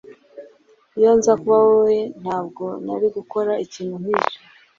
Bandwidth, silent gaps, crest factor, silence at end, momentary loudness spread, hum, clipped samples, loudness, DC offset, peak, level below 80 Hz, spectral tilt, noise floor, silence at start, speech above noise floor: 7.6 kHz; none; 18 dB; 0.4 s; 14 LU; none; under 0.1%; -19 LUFS; under 0.1%; -2 dBFS; -60 dBFS; -5.5 dB/octave; -54 dBFS; 0.35 s; 35 dB